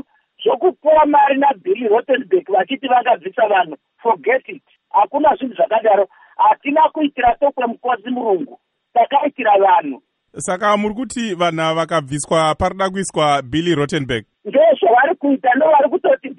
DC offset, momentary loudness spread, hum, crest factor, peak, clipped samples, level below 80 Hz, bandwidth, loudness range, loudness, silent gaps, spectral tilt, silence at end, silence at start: under 0.1%; 9 LU; none; 14 dB; -2 dBFS; under 0.1%; -50 dBFS; 11 kHz; 3 LU; -16 LUFS; none; -5 dB/octave; 0.05 s; 0.4 s